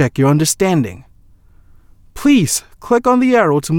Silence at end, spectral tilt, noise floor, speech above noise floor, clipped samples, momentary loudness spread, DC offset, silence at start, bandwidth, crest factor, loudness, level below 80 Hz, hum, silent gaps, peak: 0 s; -5 dB/octave; -46 dBFS; 32 dB; under 0.1%; 6 LU; under 0.1%; 0 s; 18 kHz; 14 dB; -14 LUFS; -44 dBFS; none; none; -2 dBFS